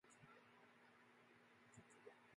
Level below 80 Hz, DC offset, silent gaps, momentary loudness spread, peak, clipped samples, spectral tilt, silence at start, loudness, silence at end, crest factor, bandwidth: under -90 dBFS; under 0.1%; none; 4 LU; -48 dBFS; under 0.1%; -4 dB/octave; 0.05 s; -68 LUFS; 0 s; 20 dB; 11 kHz